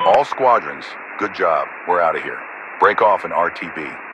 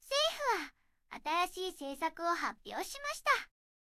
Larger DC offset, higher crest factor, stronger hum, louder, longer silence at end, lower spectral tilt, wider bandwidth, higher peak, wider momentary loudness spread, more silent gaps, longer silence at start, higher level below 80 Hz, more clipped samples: neither; about the same, 18 dB vs 20 dB; neither; first, -18 LUFS vs -35 LUFS; second, 0 s vs 0.35 s; first, -5 dB/octave vs -0.5 dB/octave; second, 10 kHz vs 16 kHz; first, 0 dBFS vs -16 dBFS; first, 14 LU vs 11 LU; neither; about the same, 0 s vs 0.05 s; first, -60 dBFS vs -68 dBFS; neither